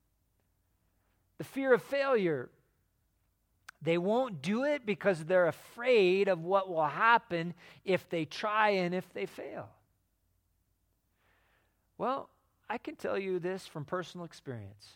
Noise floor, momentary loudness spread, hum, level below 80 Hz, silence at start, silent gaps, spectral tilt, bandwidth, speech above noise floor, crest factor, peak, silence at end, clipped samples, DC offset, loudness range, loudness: -76 dBFS; 17 LU; none; -76 dBFS; 1.4 s; none; -6 dB/octave; 17 kHz; 45 dB; 22 dB; -12 dBFS; 0.25 s; under 0.1%; under 0.1%; 14 LU; -31 LUFS